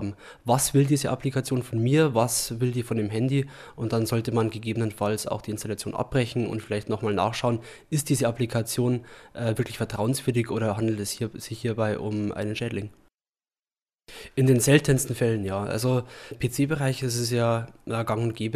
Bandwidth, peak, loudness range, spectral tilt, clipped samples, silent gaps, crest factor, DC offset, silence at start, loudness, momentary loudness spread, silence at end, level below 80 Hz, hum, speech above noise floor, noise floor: 15.5 kHz; -6 dBFS; 4 LU; -5.5 dB/octave; under 0.1%; 13.14-13.18 s; 20 dB; under 0.1%; 0 s; -26 LUFS; 10 LU; 0 s; -54 dBFS; none; over 64 dB; under -90 dBFS